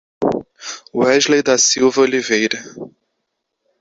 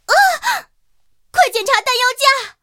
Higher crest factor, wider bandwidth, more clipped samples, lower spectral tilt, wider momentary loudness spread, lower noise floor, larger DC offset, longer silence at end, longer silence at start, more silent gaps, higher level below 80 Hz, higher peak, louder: about the same, 16 dB vs 16 dB; second, 8 kHz vs 17 kHz; neither; first, -2 dB/octave vs 1.5 dB/octave; first, 19 LU vs 8 LU; first, -74 dBFS vs -64 dBFS; neither; first, 0.95 s vs 0.1 s; about the same, 0.2 s vs 0.1 s; neither; about the same, -58 dBFS vs -58 dBFS; about the same, -2 dBFS vs 0 dBFS; about the same, -15 LUFS vs -14 LUFS